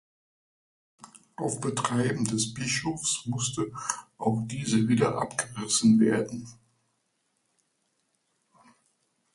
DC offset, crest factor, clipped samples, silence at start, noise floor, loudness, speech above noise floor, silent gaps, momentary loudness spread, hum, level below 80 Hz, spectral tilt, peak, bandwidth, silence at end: under 0.1%; 22 dB; under 0.1%; 1.05 s; -75 dBFS; -27 LUFS; 48 dB; none; 11 LU; none; -64 dBFS; -4.5 dB/octave; -8 dBFS; 11.5 kHz; 2.8 s